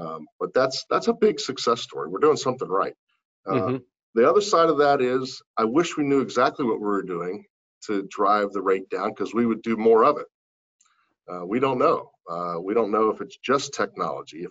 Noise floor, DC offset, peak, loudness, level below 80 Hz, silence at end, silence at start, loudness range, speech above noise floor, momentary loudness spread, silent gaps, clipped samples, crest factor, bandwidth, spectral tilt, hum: -54 dBFS; under 0.1%; -6 dBFS; -23 LUFS; -66 dBFS; 0 s; 0 s; 4 LU; 31 dB; 13 LU; 0.32-0.39 s, 2.99-3.07 s, 3.25-3.43 s, 4.03-4.13 s, 5.46-5.54 s, 7.50-7.81 s, 10.34-10.79 s; under 0.1%; 18 dB; 8 kHz; -5 dB/octave; none